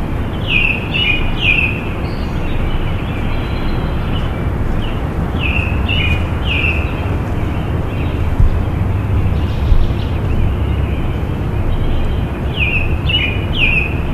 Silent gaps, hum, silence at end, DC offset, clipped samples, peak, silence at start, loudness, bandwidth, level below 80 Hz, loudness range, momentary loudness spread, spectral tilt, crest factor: none; none; 0 s; under 0.1%; under 0.1%; 0 dBFS; 0 s; -17 LUFS; 13 kHz; -18 dBFS; 3 LU; 7 LU; -7 dB/octave; 14 dB